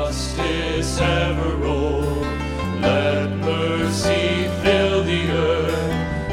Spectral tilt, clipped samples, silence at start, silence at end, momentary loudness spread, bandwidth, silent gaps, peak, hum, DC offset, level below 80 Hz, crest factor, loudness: -5.5 dB/octave; under 0.1%; 0 s; 0 s; 5 LU; 15.5 kHz; none; -6 dBFS; none; under 0.1%; -30 dBFS; 14 dB; -21 LUFS